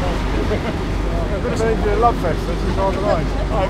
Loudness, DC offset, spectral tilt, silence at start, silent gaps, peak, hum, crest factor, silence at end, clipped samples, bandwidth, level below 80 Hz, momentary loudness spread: -20 LUFS; under 0.1%; -6.5 dB/octave; 0 s; none; -2 dBFS; none; 16 dB; 0 s; under 0.1%; 12.5 kHz; -22 dBFS; 5 LU